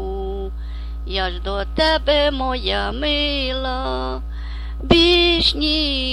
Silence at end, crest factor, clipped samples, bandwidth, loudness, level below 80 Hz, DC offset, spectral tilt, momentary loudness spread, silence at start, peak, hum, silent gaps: 0 s; 18 dB; under 0.1%; 11.5 kHz; -18 LUFS; -26 dBFS; under 0.1%; -5.5 dB/octave; 17 LU; 0 s; -2 dBFS; none; none